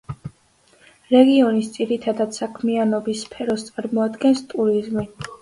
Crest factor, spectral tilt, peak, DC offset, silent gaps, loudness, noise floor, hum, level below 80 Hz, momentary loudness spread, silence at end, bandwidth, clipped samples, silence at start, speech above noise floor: 20 dB; -5.5 dB/octave; 0 dBFS; under 0.1%; none; -20 LUFS; -57 dBFS; none; -56 dBFS; 13 LU; 0.05 s; 11.5 kHz; under 0.1%; 0.1 s; 38 dB